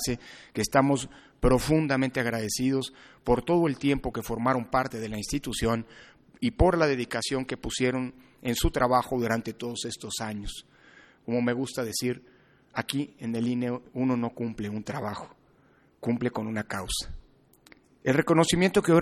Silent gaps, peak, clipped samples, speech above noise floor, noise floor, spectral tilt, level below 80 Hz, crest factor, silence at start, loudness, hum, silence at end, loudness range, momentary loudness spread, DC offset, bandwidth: none; -6 dBFS; under 0.1%; 35 dB; -62 dBFS; -5 dB/octave; -42 dBFS; 22 dB; 0 s; -28 LUFS; none; 0 s; 6 LU; 13 LU; under 0.1%; 16 kHz